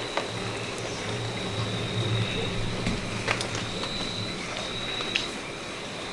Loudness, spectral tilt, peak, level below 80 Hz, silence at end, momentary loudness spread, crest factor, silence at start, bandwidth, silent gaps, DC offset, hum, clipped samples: -30 LUFS; -4 dB/octave; -6 dBFS; -44 dBFS; 0 s; 5 LU; 24 dB; 0 s; 11.5 kHz; none; under 0.1%; none; under 0.1%